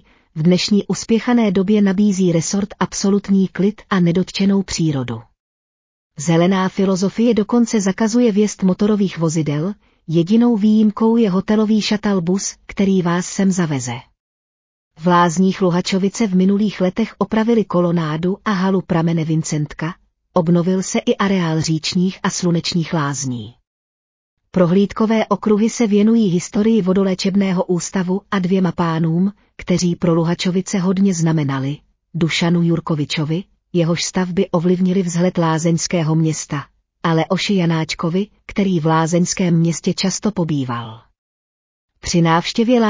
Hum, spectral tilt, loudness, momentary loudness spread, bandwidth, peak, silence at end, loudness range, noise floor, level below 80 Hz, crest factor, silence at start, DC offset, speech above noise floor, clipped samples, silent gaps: none; -6 dB/octave; -17 LUFS; 7 LU; 7.6 kHz; -4 dBFS; 0 s; 3 LU; under -90 dBFS; -50 dBFS; 14 dB; 0.35 s; under 0.1%; over 74 dB; under 0.1%; 5.40-6.10 s, 14.20-14.91 s, 23.67-24.37 s, 41.18-41.88 s